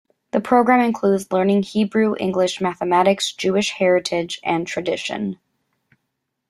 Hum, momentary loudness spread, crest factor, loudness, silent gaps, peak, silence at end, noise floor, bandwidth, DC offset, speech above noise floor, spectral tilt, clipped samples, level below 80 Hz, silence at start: none; 8 LU; 18 dB; -19 LUFS; none; -2 dBFS; 1.15 s; -76 dBFS; 13 kHz; under 0.1%; 58 dB; -5 dB/octave; under 0.1%; -62 dBFS; 0.35 s